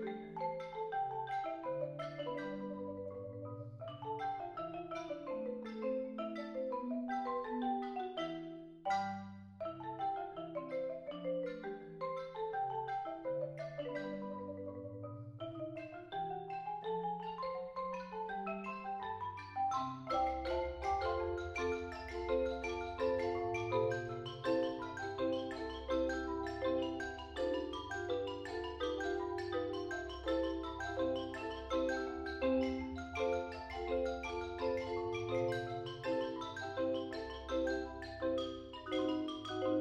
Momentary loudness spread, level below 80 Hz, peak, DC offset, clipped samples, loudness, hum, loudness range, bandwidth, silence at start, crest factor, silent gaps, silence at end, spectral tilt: 8 LU; -58 dBFS; -22 dBFS; under 0.1%; under 0.1%; -40 LUFS; none; 5 LU; 9 kHz; 0 s; 18 dB; none; 0 s; -6 dB/octave